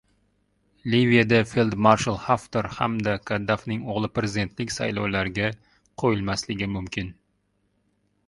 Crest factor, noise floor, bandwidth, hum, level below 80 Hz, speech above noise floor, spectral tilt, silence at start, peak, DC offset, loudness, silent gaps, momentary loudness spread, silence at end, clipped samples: 22 dB; -70 dBFS; 11.5 kHz; 50 Hz at -45 dBFS; -50 dBFS; 47 dB; -5.5 dB/octave; 0.85 s; -2 dBFS; under 0.1%; -24 LUFS; none; 10 LU; 1.15 s; under 0.1%